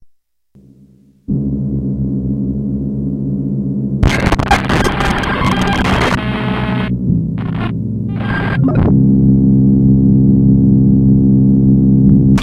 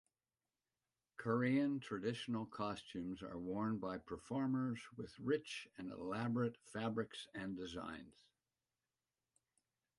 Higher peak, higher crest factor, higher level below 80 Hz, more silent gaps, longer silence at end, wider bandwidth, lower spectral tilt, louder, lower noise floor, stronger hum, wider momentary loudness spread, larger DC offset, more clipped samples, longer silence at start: first, 0 dBFS vs -26 dBFS; second, 12 dB vs 18 dB; first, -24 dBFS vs -74 dBFS; neither; second, 0 s vs 1.9 s; about the same, 11 kHz vs 11.5 kHz; about the same, -7.5 dB/octave vs -6.5 dB/octave; first, -13 LUFS vs -43 LUFS; second, -50 dBFS vs under -90 dBFS; neither; about the same, 9 LU vs 11 LU; neither; neither; about the same, 1.3 s vs 1.2 s